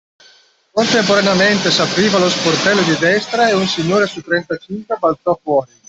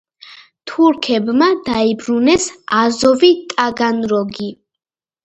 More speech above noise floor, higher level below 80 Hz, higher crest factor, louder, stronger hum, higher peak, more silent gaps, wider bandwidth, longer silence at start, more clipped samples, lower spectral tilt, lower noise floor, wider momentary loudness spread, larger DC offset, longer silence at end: first, 35 dB vs 27 dB; about the same, -54 dBFS vs -52 dBFS; about the same, 14 dB vs 16 dB; about the same, -14 LUFS vs -15 LUFS; neither; about the same, 0 dBFS vs 0 dBFS; neither; about the same, 8.4 kHz vs 8.8 kHz; first, 0.75 s vs 0.25 s; neither; about the same, -4 dB/octave vs -4 dB/octave; first, -50 dBFS vs -42 dBFS; second, 7 LU vs 11 LU; neither; second, 0.25 s vs 0.7 s